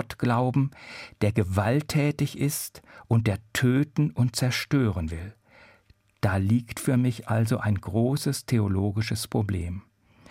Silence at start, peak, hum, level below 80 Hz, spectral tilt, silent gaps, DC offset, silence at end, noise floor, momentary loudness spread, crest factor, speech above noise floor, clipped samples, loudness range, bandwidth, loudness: 0 s; -10 dBFS; none; -54 dBFS; -6 dB/octave; none; under 0.1%; 0.5 s; -61 dBFS; 8 LU; 16 dB; 36 dB; under 0.1%; 2 LU; 16 kHz; -26 LUFS